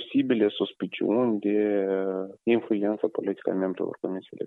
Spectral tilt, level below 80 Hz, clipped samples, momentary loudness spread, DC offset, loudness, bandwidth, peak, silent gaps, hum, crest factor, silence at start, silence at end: -9 dB/octave; -76 dBFS; under 0.1%; 7 LU; under 0.1%; -27 LUFS; 4.1 kHz; -10 dBFS; none; none; 16 dB; 0 s; 0 s